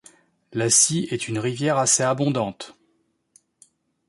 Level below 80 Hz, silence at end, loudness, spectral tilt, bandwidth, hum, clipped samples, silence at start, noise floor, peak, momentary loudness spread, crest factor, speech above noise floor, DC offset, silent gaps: -64 dBFS; 1.35 s; -20 LUFS; -3.5 dB/octave; 12 kHz; none; under 0.1%; 0.5 s; -69 dBFS; -6 dBFS; 16 LU; 20 dB; 47 dB; under 0.1%; none